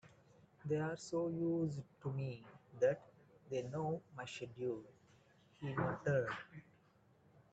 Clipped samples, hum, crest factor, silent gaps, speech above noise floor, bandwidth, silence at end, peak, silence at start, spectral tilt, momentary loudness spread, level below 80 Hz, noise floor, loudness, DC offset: under 0.1%; none; 20 dB; none; 30 dB; 8.8 kHz; 0.9 s; -22 dBFS; 0.05 s; -7 dB/octave; 12 LU; -74 dBFS; -71 dBFS; -41 LUFS; under 0.1%